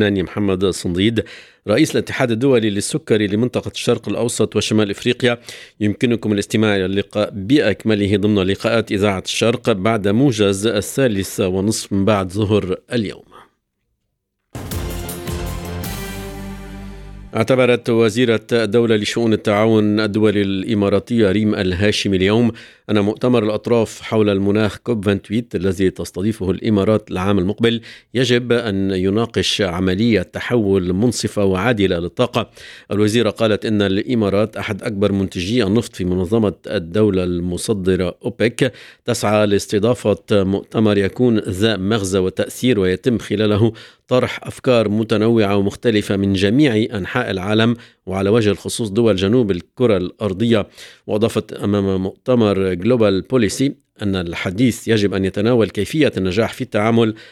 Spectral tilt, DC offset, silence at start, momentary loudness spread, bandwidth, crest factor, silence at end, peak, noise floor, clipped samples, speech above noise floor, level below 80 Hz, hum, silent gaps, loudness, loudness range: -5.5 dB/octave; under 0.1%; 0 s; 7 LU; 17 kHz; 16 dB; 0.05 s; 0 dBFS; -73 dBFS; under 0.1%; 56 dB; -44 dBFS; none; none; -18 LUFS; 3 LU